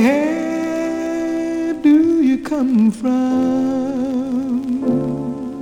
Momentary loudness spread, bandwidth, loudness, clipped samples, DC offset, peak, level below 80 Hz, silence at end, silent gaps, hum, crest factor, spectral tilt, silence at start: 8 LU; 11 kHz; -18 LUFS; under 0.1%; under 0.1%; -2 dBFS; -52 dBFS; 0 s; none; none; 14 dB; -7 dB/octave; 0 s